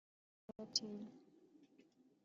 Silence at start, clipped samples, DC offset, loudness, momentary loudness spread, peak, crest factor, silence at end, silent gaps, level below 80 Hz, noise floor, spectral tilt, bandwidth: 0.6 s; under 0.1%; under 0.1%; -44 LUFS; 24 LU; -20 dBFS; 32 dB; 0.25 s; none; -90 dBFS; -71 dBFS; -3.5 dB/octave; 7.4 kHz